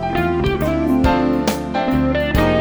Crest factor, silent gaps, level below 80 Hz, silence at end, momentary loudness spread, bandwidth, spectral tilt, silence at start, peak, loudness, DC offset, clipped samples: 16 dB; none; -28 dBFS; 0 s; 4 LU; over 20 kHz; -6.5 dB/octave; 0 s; -2 dBFS; -18 LUFS; under 0.1%; under 0.1%